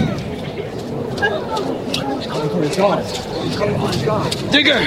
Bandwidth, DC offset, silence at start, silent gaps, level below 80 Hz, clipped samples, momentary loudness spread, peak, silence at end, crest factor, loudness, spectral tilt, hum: 16 kHz; under 0.1%; 0 s; none; -44 dBFS; under 0.1%; 10 LU; -2 dBFS; 0 s; 18 dB; -19 LUFS; -5 dB/octave; none